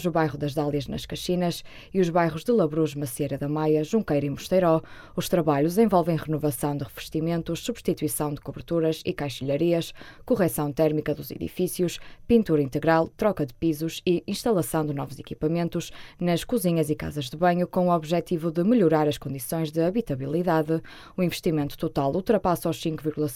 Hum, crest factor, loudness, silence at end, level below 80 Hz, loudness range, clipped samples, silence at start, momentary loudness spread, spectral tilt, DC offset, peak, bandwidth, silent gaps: none; 18 dB; -25 LUFS; 0 s; -50 dBFS; 3 LU; under 0.1%; 0 s; 9 LU; -6 dB/octave; under 0.1%; -8 dBFS; 17 kHz; none